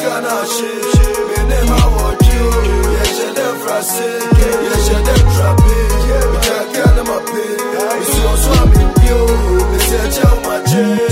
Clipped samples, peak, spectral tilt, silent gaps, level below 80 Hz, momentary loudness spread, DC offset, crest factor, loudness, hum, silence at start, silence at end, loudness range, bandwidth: under 0.1%; 0 dBFS; -5 dB/octave; none; -14 dBFS; 6 LU; under 0.1%; 12 dB; -13 LUFS; none; 0 s; 0 s; 1 LU; 16.5 kHz